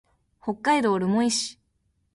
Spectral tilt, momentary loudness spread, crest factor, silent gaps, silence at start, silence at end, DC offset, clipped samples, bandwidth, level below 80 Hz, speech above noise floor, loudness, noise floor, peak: -4 dB/octave; 12 LU; 16 dB; none; 0.45 s; 0.65 s; under 0.1%; under 0.1%; 11.5 kHz; -64 dBFS; 48 dB; -24 LUFS; -71 dBFS; -10 dBFS